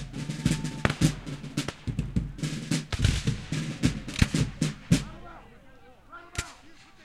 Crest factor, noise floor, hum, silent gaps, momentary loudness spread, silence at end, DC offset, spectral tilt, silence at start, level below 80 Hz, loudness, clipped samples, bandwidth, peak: 28 dB; -52 dBFS; none; none; 16 LU; 0 s; under 0.1%; -5 dB/octave; 0 s; -40 dBFS; -30 LUFS; under 0.1%; 14 kHz; 0 dBFS